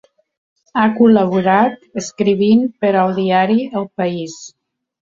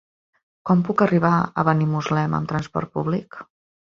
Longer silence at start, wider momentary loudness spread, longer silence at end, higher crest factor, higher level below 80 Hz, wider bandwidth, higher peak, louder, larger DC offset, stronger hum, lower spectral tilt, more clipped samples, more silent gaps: about the same, 0.75 s vs 0.65 s; first, 14 LU vs 10 LU; first, 0.65 s vs 0.5 s; second, 14 dB vs 20 dB; about the same, -58 dBFS vs -54 dBFS; about the same, 7.6 kHz vs 7.2 kHz; about the same, 0 dBFS vs -2 dBFS; first, -15 LUFS vs -21 LUFS; neither; neither; second, -6 dB/octave vs -8 dB/octave; neither; neither